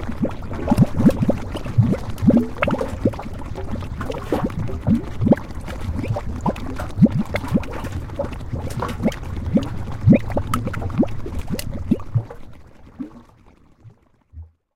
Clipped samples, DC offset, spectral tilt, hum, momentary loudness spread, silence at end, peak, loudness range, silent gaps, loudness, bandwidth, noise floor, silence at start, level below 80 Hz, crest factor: under 0.1%; under 0.1%; -8 dB/octave; none; 13 LU; 0.3 s; -2 dBFS; 7 LU; none; -22 LUFS; 16.5 kHz; -50 dBFS; 0 s; -34 dBFS; 20 dB